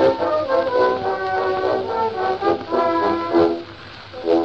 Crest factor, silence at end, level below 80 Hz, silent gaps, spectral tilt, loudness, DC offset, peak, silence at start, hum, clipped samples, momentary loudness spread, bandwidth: 14 dB; 0 s; -52 dBFS; none; -6.5 dB/octave; -20 LUFS; 0.2%; -4 dBFS; 0 s; none; under 0.1%; 11 LU; 7.2 kHz